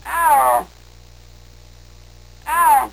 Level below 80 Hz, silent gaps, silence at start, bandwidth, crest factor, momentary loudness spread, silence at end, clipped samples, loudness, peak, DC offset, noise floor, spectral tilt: -46 dBFS; none; 0.05 s; 16.5 kHz; 14 dB; 19 LU; 0.05 s; under 0.1%; -16 LUFS; -6 dBFS; 0.4%; -44 dBFS; -2 dB/octave